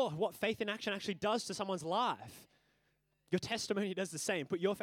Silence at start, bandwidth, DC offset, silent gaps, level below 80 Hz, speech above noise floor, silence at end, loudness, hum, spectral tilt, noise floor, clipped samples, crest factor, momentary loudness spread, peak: 0 s; 17.5 kHz; under 0.1%; none; -76 dBFS; 41 dB; 0 s; -37 LUFS; none; -4 dB/octave; -78 dBFS; under 0.1%; 18 dB; 4 LU; -20 dBFS